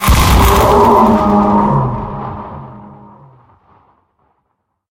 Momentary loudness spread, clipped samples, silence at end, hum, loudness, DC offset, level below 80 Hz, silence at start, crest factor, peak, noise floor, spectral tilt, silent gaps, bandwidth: 20 LU; under 0.1%; 2 s; none; -10 LUFS; under 0.1%; -20 dBFS; 0 s; 12 dB; 0 dBFS; -67 dBFS; -6 dB/octave; none; 17.5 kHz